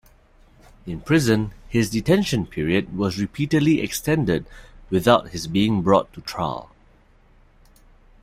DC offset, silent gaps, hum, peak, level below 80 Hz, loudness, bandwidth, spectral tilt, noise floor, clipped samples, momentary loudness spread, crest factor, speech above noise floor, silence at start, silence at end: under 0.1%; none; none; -2 dBFS; -46 dBFS; -21 LUFS; 16 kHz; -6 dB/octave; -54 dBFS; under 0.1%; 9 LU; 22 dB; 33 dB; 0.85 s; 1.6 s